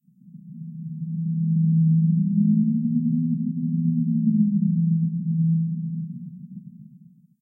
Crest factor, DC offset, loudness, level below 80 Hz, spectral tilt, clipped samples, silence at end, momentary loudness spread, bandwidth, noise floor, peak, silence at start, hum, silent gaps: 12 dB; under 0.1%; -22 LUFS; -74 dBFS; -16.5 dB/octave; under 0.1%; 0.6 s; 18 LU; 0.3 kHz; -51 dBFS; -10 dBFS; 0.25 s; none; none